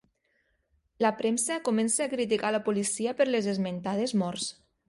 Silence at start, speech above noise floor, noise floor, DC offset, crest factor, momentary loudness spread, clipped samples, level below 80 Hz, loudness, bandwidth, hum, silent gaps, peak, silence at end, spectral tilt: 1 s; 45 dB; -73 dBFS; under 0.1%; 18 dB; 5 LU; under 0.1%; -70 dBFS; -28 LUFS; 11.5 kHz; none; none; -12 dBFS; 0.35 s; -4 dB/octave